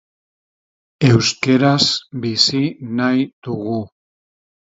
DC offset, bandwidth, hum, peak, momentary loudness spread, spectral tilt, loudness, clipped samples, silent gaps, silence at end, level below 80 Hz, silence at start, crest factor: under 0.1%; 8 kHz; none; 0 dBFS; 11 LU; -5 dB/octave; -17 LUFS; under 0.1%; 3.33-3.42 s; 0.85 s; -52 dBFS; 1 s; 18 dB